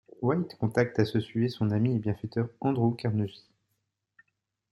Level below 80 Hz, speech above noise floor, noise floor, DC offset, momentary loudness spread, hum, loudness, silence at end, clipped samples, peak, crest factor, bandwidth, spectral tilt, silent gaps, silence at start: -64 dBFS; 52 dB; -80 dBFS; under 0.1%; 5 LU; none; -29 LUFS; 1.35 s; under 0.1%; -10 dBFS; 20 dB; 12 kHz; -8.5 dB/octave; none; 0.2 s